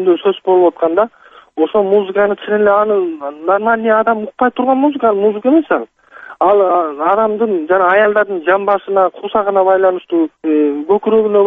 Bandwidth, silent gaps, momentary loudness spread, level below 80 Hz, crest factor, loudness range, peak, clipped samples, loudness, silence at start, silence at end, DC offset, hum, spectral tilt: 3.8 kHz; none; 5 LU; -58 dBFS; 12 dB; 1 LU; 0 dBFS; under 0.1%; -13 LUFS; 0 s; 0 s; under 0.1%; none; -8.5 dB/octave